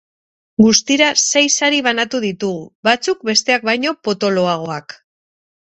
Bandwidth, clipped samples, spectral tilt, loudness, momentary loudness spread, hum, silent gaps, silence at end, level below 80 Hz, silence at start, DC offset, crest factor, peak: 8.4 kHz; under 0.1%; -2.5 dB/octave; -15 LUFS; 11 LU; none; 2.75-2.83 s; 0.85 s; -56 dBFS; 0.6 s; under 0.1%; 16 dB; 0 dBFS